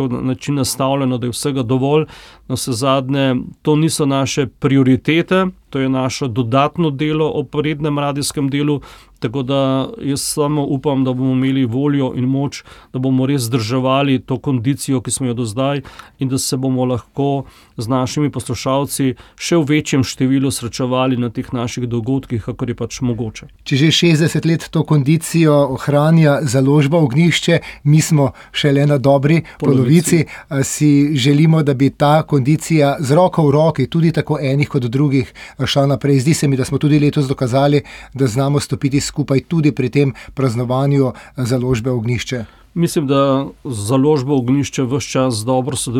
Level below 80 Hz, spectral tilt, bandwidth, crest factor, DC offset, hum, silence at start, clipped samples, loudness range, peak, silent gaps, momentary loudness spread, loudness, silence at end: -46 dBFS; -6 dB/octave; 16.5 kHz; 14 dB; under 0.1%; none; 0 s; under 0.1%; 5 LU; -2 dBFS; none; 8 LU; -16 LUFS; 0 s